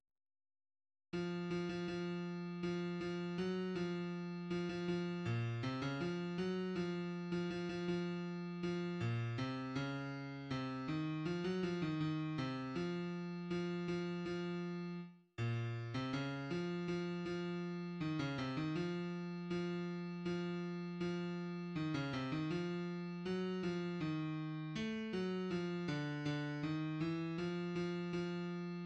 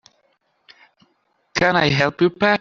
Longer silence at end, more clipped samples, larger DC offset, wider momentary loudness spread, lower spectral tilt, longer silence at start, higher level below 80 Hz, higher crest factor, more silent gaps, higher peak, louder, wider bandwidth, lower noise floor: about the same, 0 s vs 0 s; neither; neither; about the same, 4 LU vs 4 LU; first, -7 dB/octave vs -5.5 dB/octave; second, 1.15 s vs 1.55 s; second, -70 dBFS vs -52 dBFS; about the same, 14 dB vs 18 dB; neither; second, -28 dBFS vs -2 dBFS; second, -42 LUFS vs -18 LUFS; first, 8.4 kHz vs 7.4 kHz; first, under -90 dBFS vs -66 dBFS